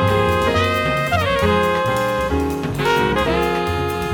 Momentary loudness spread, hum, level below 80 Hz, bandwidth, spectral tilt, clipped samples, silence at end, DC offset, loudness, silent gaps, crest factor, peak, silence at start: 4 LU; none; -34 dBFS; 19.5 kHz; -5.5 dB/octave; under 0.1%; 0 s; under 0.1%; -18 LUFS; none; 16 dB; -2 dBFS; 0 s